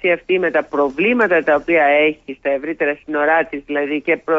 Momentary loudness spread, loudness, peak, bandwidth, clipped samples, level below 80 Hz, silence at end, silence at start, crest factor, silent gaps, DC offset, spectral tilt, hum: 8 LU; -17 LUFS; -4 dBFS; 7.4 kHz; under 0.1%; -54 dBFS; 0 s; 0 s; 12 dB; none; under 0.1%; -6.5 dB/octave; none